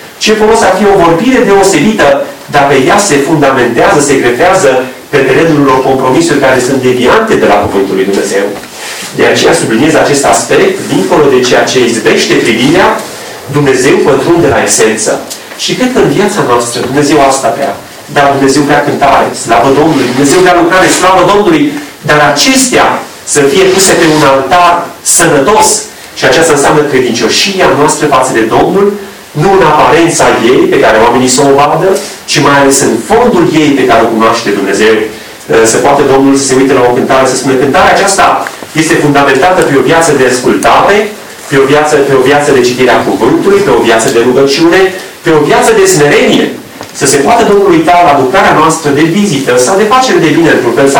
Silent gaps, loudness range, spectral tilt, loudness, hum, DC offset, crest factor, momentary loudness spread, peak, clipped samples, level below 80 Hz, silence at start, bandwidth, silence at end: none; 2 LU; -4 dB/octave; -6 LUFS; none; under 0.1%; 6 dB; 6 LU; 0 dBFS; 0.1%; -36 dBFS; 0 s; over 20 kHz; 0 s